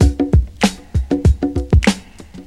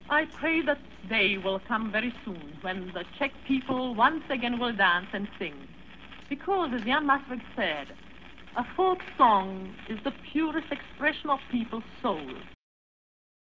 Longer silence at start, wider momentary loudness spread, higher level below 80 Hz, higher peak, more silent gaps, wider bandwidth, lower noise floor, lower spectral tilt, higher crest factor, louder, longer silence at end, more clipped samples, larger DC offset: about the same, 0 s vs 0 s; second, 6 LU vs 16 LU; first, -20 dBFS vs -56 dBFS; first, 0 dBFS vs -8 dBFS; neither; first, 12.5 kHz vs 7.4 kHz; second, -36 dBFS vs -49 dBFS; about the same, -6 dB/octave vs -6.5 dB/octave; about the same, 16 dB vs 20 dB; first, -17 LUFS vs -29 LUFS; second, 0.05 s vs 0.75 s; neither; about the same, 0.4% vs 0.3%